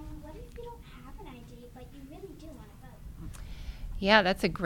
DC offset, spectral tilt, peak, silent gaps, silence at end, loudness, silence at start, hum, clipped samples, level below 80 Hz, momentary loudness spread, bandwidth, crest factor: under 0.1%; -5 dB/octave; -4 dBFS; none; 0 s; -25 LUFS; 0 s; none; under 0.1%; -46 dBFS; 26 LU; 18 kHz; 28 dB